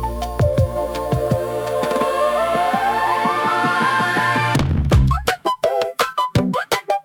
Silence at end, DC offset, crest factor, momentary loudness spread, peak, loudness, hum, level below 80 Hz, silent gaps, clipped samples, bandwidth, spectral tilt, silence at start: 0.05 s; under 0.1%; 16 dB; 5 LU; -2 dBFS; -19 LUFS; none; -30 dBFS; none; under 0.1%; 18 kHz; -5.5 dB/octave; 0 s